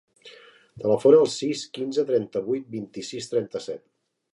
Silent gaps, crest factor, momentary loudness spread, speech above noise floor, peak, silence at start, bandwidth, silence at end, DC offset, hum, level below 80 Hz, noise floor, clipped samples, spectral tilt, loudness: none; 20 dB; 17 LU; 26 dB; -4 dBFS; 0.25 s; 11.5 kHz; 0.55 s; under 0.1%; none; -70 dBFS; -50 dBFS; under 0.1%; -5 dB/octave; -24 LUFS